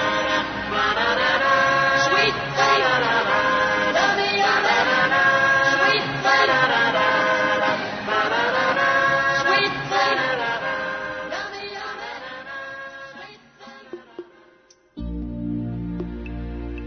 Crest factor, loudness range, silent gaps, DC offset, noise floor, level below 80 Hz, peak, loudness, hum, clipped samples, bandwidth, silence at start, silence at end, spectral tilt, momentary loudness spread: 16 dB; 17 LU; none; under 0.1%; -55 dBFS; -44 dBFS; -6 dBFS; -19 LUFS; none; under 0.1%; 6.6 kHz; 0 s; 0 s; -3.5 dB/octave; 16 LU